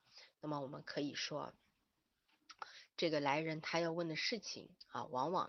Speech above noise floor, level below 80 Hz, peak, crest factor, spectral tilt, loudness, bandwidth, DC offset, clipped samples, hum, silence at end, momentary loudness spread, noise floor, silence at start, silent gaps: 44 dB; -84 dBFS; -20 dBFS; 22 dB; -4.5 dB/octave; -41 LUFS; 7.2 kHz; under 0.1%; under 0.1%; none; 0 s; 15 LU; -84 dBFS; 0.15 s; none